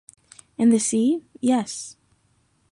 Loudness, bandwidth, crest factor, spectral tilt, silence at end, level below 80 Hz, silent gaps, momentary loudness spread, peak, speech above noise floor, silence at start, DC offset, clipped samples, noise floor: -22 LUFS; 11.5 kHz; 16 dB; -4.5 dB/octave; 0.8 s; -68 dBFS; none; 17 LU; -8 dBFS; 44 dB; 0.6 s; under 0.1%; under 0.1%; -65 dBFS